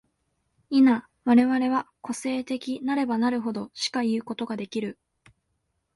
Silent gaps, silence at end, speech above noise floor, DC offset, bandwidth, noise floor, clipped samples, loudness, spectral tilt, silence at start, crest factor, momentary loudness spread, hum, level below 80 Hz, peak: none; 1.05 s; 51 dB; under 0.1%; 11.5 kHz; -76 dBFS; under 0.1%; -25 LUFS; -4.5 dB/octave; 0.7 s; 18 dB; 12 LU; none; -68 dBFS; -8 dBFS